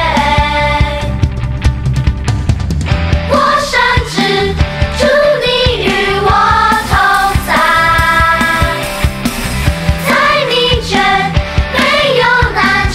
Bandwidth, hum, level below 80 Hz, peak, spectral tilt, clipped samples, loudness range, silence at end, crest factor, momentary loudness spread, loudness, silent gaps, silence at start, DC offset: 16.5 kHz; none; -20 dBFS; 0 dBFS; -4.5 dB/octave; under 0.1%; 3 LU; 0 s; 10 dB; 7 LU; -11 LUFS; none; 0 s; under 0.1%